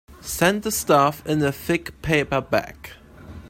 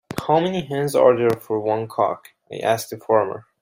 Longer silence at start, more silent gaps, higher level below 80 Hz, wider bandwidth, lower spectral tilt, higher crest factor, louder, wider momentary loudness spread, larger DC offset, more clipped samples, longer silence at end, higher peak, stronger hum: about the same, 0.1 s vs 0.1 s; neither; first, -46 dBFS vs -60 dBFS; about the same, 16.5 kHz vs 16 kHz; second, -4.5 dB/octave vs -6 dB/octave; about the same, 18 dB vs 18 dB; about the same, -21 LUFS vs -21 LUFS; first, 14 LU vs 10 LU; neither; neither; second, 0 s vs 0.2 s; about the same, -4 dBFS vs -2 dBFS; neither